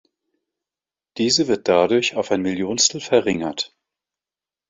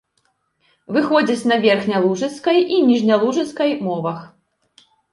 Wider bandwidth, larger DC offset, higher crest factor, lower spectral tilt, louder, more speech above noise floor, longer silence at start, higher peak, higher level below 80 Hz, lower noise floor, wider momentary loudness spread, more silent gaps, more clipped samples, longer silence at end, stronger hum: second, 8 kHz vs 11.5 kHz; neither; about the same, 20 dB vs 16 dB; second, -3 dB/octave vs -5.5 dB/octave; about the same, -19 LUFS vs -18 LUFS; first, over 71 dB vs 50 dB; first, 1.15 s vs 0.9 s; about the same, -2 dBFS vs -2 dBFS; first, -58 dBFS vs -66 dBFS; first, under -90 dBFS vs -67 dBFS; about the same, 10 LU vs 8 LU; neither; neither; first, 1.05 s vs 0.85 s; neither